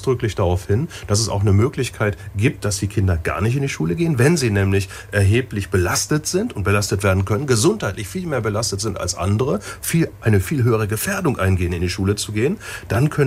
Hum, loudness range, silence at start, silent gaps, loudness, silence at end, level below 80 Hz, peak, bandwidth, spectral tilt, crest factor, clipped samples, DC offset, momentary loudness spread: none; 2 LU; 0 s; none; -20 LUFS; 0 s; -40 dBFS; -2 dBFS; 16 kHz; -5.5 dB/octave; 16 dB; under 0.1%; under 0.1%; 6 LU